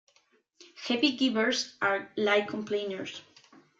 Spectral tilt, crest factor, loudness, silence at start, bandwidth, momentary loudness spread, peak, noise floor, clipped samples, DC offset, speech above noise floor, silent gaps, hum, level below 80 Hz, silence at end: -3 dB/octave; 20 dB; -29 LUFS; 0.6 s; 7.8 kHz; 13 LU; -10 dBFS; -68 dBFS; under 0.1%; under 0.1%; 39 dB; none; none; -76 dBFS; 0.6 s